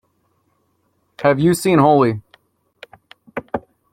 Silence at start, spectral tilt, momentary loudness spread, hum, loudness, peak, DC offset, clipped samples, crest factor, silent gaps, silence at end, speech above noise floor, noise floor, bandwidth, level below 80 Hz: 1.2 s; -6.5 dB/octave; 18 LU; none; -16 LUFS; -2 dBFS; under 0.1%; under 0.1%; 18 dB; none; 0.35 s; 51 dB; -65 dBFS; 16.5 kHz; -54 dBFS